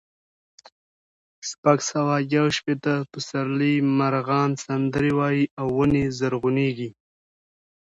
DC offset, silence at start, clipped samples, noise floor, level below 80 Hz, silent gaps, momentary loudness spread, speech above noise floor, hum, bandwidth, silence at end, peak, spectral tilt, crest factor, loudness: under 0.1%; 1.45 s; under 0.1%; under -90 dBFS; -54 dBFS; 1.58-1.63 s, 5.51-5.57 s; 6 LU; over 68 dB; none; 8 kHz; 1 s; -4 dBFS; -6 dB/octave; 20 dB; -23 LUFS